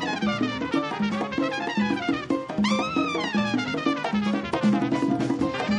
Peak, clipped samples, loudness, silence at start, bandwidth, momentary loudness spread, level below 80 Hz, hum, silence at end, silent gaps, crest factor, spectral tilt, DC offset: -12 dBFS; under 0.1%; -25 LUFS; 0 s; 10.5 kHz; 3 LU; -56 dBFS; none; 0 s; none; 12 dB; -5.5 dB/octave; under 0.1%